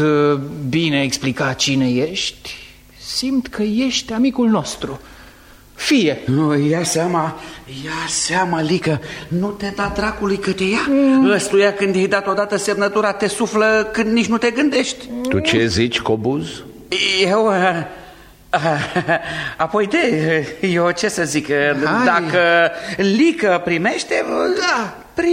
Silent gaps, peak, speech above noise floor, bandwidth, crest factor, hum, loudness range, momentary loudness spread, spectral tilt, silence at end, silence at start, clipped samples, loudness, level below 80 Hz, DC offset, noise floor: none; -2 dBFS; 27 dB; 16 kHz; 16 dB; none; 4 LU; 9 LU; -4.5 dB/octave; 0 s; 0 s; under 0.1%; -17 LUFS; -46 dBFS; under 0.1%; -44 dBFS